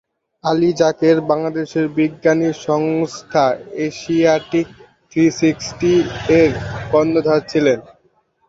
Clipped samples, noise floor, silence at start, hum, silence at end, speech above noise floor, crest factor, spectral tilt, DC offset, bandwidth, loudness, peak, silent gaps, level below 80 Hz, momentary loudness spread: under 0.1%; -60 dBFS; 0.45 s; none; 0.7 s; 44 dB; 16 dB; -6 dB/octave; under 0.1%; 7.8 kHz; -17 LUFS; 0 dBFS; none; -48 dBFS; 8 LU